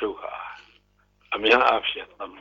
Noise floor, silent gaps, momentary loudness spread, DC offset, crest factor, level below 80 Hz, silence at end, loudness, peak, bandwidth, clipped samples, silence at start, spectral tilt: -63 dBFS; none; 20 LU; under 0.1%; 22 dB; -58 dBFS; 0 s; -22 LUFS; -4 dBFS; 7.6 kHz; under 0.1%; 0 s; -3.5 dB/octave